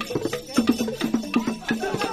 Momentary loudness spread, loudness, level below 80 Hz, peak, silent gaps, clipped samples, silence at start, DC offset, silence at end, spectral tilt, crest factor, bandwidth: 4 LU; -25 LUFS; -52 dBFS; -6 dBFS; none; under 0.1%; 0 s; under 0.1%; 0 s; -4.5 dB/octave; 18 dB; 15.5 kHz